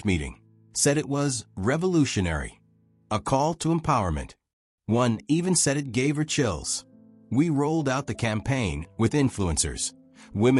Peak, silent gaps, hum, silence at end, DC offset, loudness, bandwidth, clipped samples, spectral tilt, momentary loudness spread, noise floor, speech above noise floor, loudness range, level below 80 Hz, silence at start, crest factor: -10 dBFS; 4.53-4.78 s; none; 0 s; under 0.1%; -25 LUFS; 13.5 kHz; under 0.1%; -5 dB/octave; 9 LU; -62 dBFS; 37 dB; 2 LU; -44 dBFS; 0 s; 16 dB